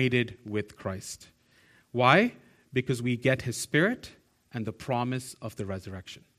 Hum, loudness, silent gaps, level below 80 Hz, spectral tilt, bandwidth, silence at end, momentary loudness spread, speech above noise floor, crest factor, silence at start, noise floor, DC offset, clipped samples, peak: none; -29 LUFS; none; -62 dBFS; -5.5 dB/octave; 14.5 kHz; 0.25 s; 18 LU; 33 dB; 24 dB; 0 s; -62 dBFS; under 0.1%; under 0.1%; -4 dBFS